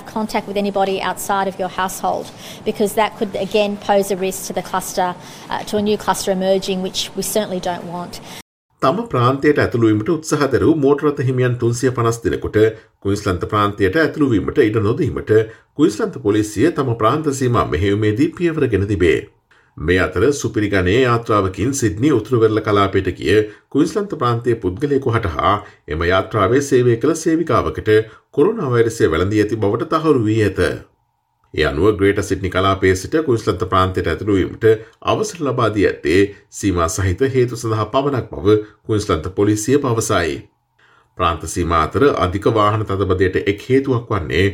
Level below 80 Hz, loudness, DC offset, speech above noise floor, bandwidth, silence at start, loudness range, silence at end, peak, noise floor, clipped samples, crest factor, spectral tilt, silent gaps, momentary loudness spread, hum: -42 dBFS; -17 LUFS; under 0.1%; 48 dB; 16.5 kHz; 0 s; 4 LU; 0 s; -2 dBFS; -65 dBFS; under 0.1%; 16 dB; -6 dB/octave; 8.42-8.69 s; 7 LU; none